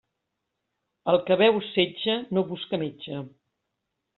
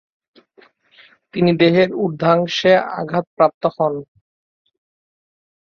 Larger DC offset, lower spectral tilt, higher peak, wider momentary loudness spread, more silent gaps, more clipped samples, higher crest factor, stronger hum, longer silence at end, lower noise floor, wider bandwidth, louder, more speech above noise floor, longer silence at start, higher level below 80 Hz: neither; second, -3.5 dB/octave vs -6.5 dB/octave; second, -8 dBFS vs -2 dBFS; first, 16 LU vs 9 LU; second, none vs 3.27-3.37 s, 3.54-3.61 s; neither; about the same, 20 dB vs 18 dB; neither; second, 0.9 s vs 1.6 s; first, -81 dBFS vs -53 dBFS; second, 4.3 kHz vs 7 kHz; second, -25 LUFS vs -17 LUFS; first, 57 dB vs 37 dB; second, 1.05 s vs 1.35 s; second, -68 dBFS vs -60 dBFS